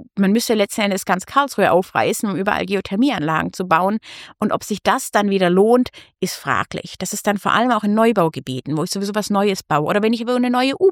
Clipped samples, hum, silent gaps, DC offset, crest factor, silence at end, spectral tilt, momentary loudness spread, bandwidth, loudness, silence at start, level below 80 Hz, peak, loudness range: under 0.1%; none; none; under 0.1%; 18 dB; 0 s; -5 dB/octave; 9 LU; 17.5 kHz; -18 LUFS; 0 s; -56 dBFS; 0 dBFS; 2 LU